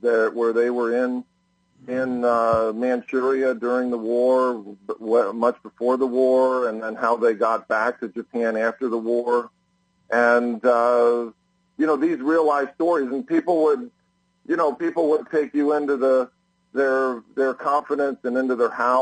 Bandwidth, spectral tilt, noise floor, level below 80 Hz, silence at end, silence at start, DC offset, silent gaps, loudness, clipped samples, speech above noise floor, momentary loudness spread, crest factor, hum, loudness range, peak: 9.4 kHz; -6 dB/octave; -66 dBFS; -64 dBFS; 0 s; 0.05 s; under 0.1%; none; -22 LUFS; under 0.1%; 46 dB; 8 LU; 16 dB; none; 2 LU; -6 dBFS